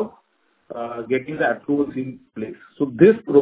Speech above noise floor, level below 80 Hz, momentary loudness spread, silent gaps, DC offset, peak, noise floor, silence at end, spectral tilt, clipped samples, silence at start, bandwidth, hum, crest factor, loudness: 45 dB; -58 dBFS; 18 LU; none; under 0.1%; 0 dBFS; -65 dBFS; 0 s; -11.5 dB/octave; under 0.1%; 0 s; 4 kHz; none; 20 dB; -20 LUFS